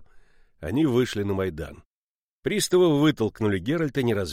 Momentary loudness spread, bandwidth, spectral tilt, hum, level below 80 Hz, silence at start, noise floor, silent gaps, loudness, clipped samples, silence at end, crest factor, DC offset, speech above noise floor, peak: 13 LU; 16 kHz; -5.5 dB/octave; none; -50 dBFS; 0 s; under -90 dBFS; 1.86-2.43 s; -24 LUFS; under 0.1%; 0 s; 16 dB; under 0.1%; over 67 dB; -10 dBFS